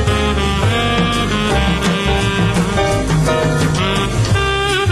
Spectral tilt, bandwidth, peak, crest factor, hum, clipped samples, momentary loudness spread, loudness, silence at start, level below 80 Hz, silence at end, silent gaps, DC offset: -5 dB/octave; 14.5 kHz; -4 dBFS; 12 dB; none; under 0.1%; 1 LU; -15 LUFS; 0 s; -24 dBFS; 0 s; none; 0.2%